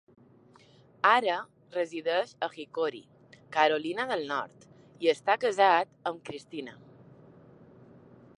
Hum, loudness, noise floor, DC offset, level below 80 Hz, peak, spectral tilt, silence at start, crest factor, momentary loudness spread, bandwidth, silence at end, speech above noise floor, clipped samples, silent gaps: none; -29 LUFS; -58 dBFS; under 0.1%; -78 dBFS; -8 dBFS; -4 dB/octave; 1.05 s; 24 dB; 17 LU; 11 kHz; 1.65 s; 30 dB; under 0.1%; none